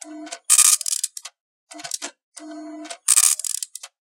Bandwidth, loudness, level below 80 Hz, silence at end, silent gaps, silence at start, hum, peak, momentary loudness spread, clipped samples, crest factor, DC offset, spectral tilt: 17.5 kHz; -16 LUFS; under -90 dBFS; 0.2 s; 1.40-1.67 s, 2.23-2.32 s; 0.05 s; none; 0 dBFS; 24 LU; under 0.1%; 24 dB; under 0.1%; 3 dB/octave